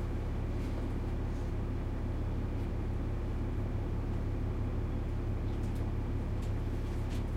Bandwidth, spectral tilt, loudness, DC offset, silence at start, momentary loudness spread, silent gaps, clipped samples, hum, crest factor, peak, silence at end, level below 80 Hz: 9.8 kHz; -8.5 dB/octave; -37 LUFS; under 0.1%; 0 s; 1 LU; none; under 0.1%; none; 10 dB; -24 dBFS; 0 s; -36 dBFS